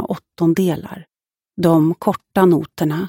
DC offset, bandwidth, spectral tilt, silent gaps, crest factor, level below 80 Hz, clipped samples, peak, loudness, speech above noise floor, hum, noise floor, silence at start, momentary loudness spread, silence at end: under 0.1%; 17 kHz; -7.5 dB/octave; none; 16 dB; -54 dBFS; under 0.1%; -2 dBFS; -17 LUFS; 73 dB; none; -90 dBFS; 0 s; 17 LU; 0 s